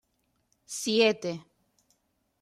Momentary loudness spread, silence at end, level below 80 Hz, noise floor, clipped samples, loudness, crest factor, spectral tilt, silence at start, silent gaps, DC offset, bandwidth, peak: 16 LU; 1 s; -78 dBFS; -75 dBFS; under 0.1%; -27 LUFS; 20 dB; -3 dB/octave; 0.7 s; none; under 0.1%; 14.5 kHz; -12 dBFS